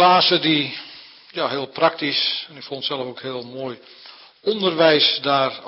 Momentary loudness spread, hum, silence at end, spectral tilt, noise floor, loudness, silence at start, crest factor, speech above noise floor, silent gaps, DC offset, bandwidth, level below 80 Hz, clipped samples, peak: 18 LU; none; 0 s; -8 dB/octave; -43 dBFS; -19 LUFS; 0 s; 16 dB; 23 dB; none; under 0.1%; 5.8 kHz; -72 dBFS; under 0.1%; -4 dBFS